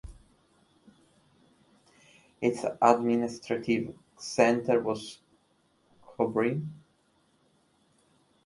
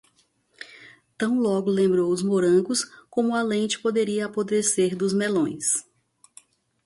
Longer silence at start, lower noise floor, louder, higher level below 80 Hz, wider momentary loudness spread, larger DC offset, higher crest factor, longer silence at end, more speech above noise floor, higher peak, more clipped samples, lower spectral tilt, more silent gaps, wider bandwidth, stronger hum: second, 0.05 s vs 0.6 s; first, -69 dBFS vs -65 dBFS; second, -28 LUFS vs -23 LUFS; first, -62 dBFS vs -68 dBFS; first, 14 LU vs 8 LU; neither; first, 26 dB vs 14 dB; first, 1.7 s vs 1.05 s; about the same, 42 dB vs 43 dB; first, -6 dBFS vs -10 dBFS; neither; about the same, -5.5 dB/octave vs -4.5 dB/octave; neither; about the same, 11.5 kHz vs 11.5 kHz; neither